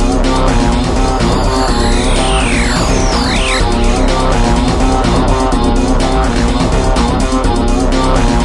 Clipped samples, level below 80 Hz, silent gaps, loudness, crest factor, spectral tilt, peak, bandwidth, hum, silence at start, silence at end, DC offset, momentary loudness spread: under 0.1%; -14 dBFS; none; -13 LUFS; 10 dB; -5 dB/octave; 0 dBFS; 11.5 kHz; none; 0 s; 0 s; under 0.1%; 1 LU